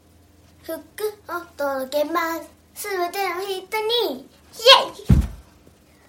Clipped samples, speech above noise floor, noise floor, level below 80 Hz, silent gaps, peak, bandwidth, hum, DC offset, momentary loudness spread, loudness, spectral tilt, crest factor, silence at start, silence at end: under 0.1%; 31 dB; -53 dBFS; -34 dBFS; none; 0 dBFS; 17 kHz; none; under 0.1%; 20 LU; -20 LUFS; -4 dB/octave; 22 dB; 0.65 s; 0.65 s